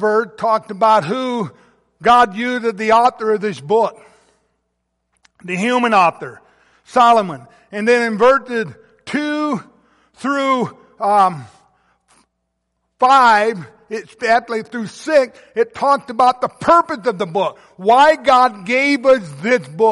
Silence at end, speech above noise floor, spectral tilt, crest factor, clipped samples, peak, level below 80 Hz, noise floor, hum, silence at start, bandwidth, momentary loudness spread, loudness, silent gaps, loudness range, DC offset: 0 s; 57 dB; -5 dB/octave; 14 dB; under 0.1%; -2 dBFS; -58 dBFS; -72 dBFS; none; 0 s; 11.5 kHz; 14 LU; -15 LUFS; none; 5 LU; under 0.1%